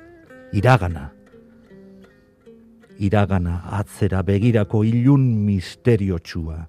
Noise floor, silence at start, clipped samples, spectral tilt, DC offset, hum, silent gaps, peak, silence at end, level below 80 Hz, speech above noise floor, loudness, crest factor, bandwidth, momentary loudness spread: -50 dBFS; 0.3 s; under 0.1%; -8 dB/octave; under 0.1%; none; none; 0 dBFS; 0 s; -46 dBFS; 32 dB; -20 LUFS; 20 dB; 12.5 kHz; 11 LU